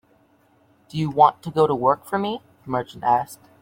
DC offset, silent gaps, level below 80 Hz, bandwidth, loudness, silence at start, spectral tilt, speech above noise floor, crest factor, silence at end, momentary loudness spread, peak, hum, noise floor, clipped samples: under 0.1%; none; -60 dBFS; 16.5 kHz; -21 LUFS; 0.95 s; -6.5 dB/octave; 38 dB; 20 dB; 0.25 s; 13 LU; -2 dBFS; none; -59 dBFS; under 0.1%